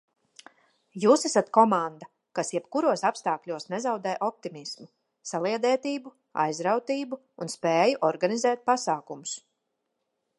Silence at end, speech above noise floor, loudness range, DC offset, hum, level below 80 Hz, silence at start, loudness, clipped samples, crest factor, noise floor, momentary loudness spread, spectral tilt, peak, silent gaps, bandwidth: 1 s; 53 dB; 4 LU; under 0.1%; none; -84 dBFS; 0.95 s; -27 LUFS; under 0.1%; 22 dB; -80 dBFS; 15 LU; -4 dB/octave; -4 dBFS; none; 11.5 kHz